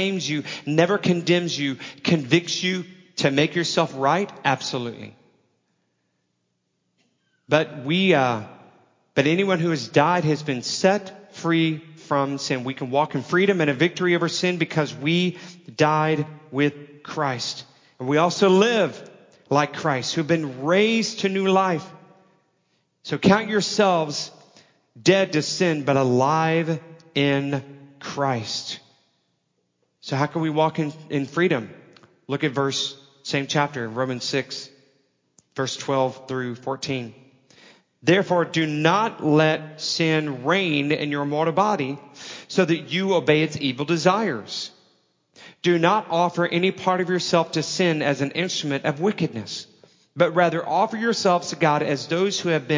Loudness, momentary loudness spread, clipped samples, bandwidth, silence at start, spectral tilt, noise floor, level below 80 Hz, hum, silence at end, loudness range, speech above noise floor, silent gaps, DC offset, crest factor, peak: -22 LUFS; 11 LU; under 0.1%; 7.6 kHz; 0 s; -5 dB/octave; -74 dBFS; -68 dBFS; none; 0 s; 5 LU; 52 dB; none; under 0.1%; 20 dB; -2 dBFS